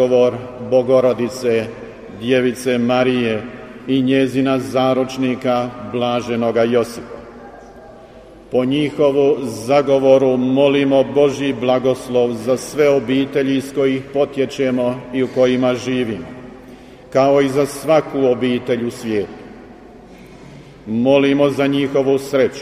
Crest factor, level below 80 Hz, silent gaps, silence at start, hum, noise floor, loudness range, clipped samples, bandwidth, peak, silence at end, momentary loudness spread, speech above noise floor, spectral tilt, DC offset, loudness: 16 dB; -50 dBFS; none; 0 s; none; -40 dBFS; 5 LU; under 0.1%; 15 kHz; 0 dBFS; 0 s; 11 LU; 24 dB; -6 dB/octave; under 0.1%; -17 LUFS